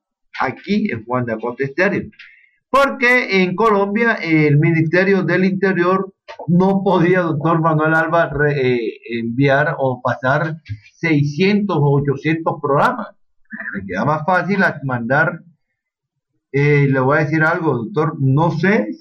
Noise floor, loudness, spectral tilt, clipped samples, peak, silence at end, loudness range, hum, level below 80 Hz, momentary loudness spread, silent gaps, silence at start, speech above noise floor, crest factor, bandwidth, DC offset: -78 dBFS; -16 LUFS; -8 dB/octave; under 0.1%; -2 dBFS; 0.05 s; 4 LU; none; -52 dBFS; 10 LU; none; 0.35 s; 62 dB; 14 dB; 8 kHz; under 0.1%